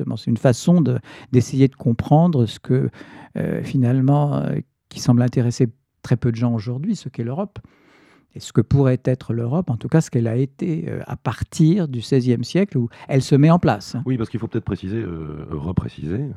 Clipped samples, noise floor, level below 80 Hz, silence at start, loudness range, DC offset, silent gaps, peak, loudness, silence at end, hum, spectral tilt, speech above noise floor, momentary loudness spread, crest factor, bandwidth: under 0.1%; -53 dBFS; -48 dBFS; 0 s; 4 LU; under 0.1%; none; -2 dBFS; -20 LUFS; 0 s; none; -7.5 dB/octave; 34 dB; 11 LU; 18 dB; 12 kHz